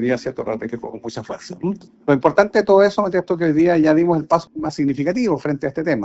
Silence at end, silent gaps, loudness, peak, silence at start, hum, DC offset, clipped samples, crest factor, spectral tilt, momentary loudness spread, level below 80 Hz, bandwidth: 0 s; none; -18 LUFS; 0 dBFS; 0 s; none; under 0.1%; under 0.1%; 18 dB; -6 dB/octave; 15 LU; -54 dBFS; 8 kHz